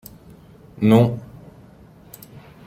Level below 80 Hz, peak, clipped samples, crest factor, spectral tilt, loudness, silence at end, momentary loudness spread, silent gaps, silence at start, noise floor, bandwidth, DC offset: -54 dBFS; -4 dBFS; under 0.1%; 20 dB; -8.5 dB/octave; -17 LUFS; 1.4 s; 27 LU; none; 0.8 s; -47 dBFS; 16.5 kHz; under 0.1%